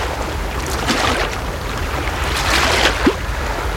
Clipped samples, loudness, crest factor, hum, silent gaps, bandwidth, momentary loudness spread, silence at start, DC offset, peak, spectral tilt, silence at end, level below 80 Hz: under 0.1%; -18 LUFS; 18 dB; none; none; 16.5 kHz; 9 LU; 0 s; under 0.1%; -2 dBFS; -3.5 dB/octave; 0 s; -26 dBFS